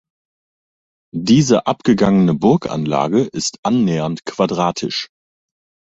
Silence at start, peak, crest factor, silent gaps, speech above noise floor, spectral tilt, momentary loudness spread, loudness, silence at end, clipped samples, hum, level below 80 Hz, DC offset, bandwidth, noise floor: 1.15 s; -2 dBFS; 16 dB; 3.58-3.63 s; over 74 dB; -6 dB/octave; 10 LU; -16 LUFS; 0.9 s; under 0.1%; none; -50 dBFS; under 0.1%; 8.2 kHz; under -90 dBFS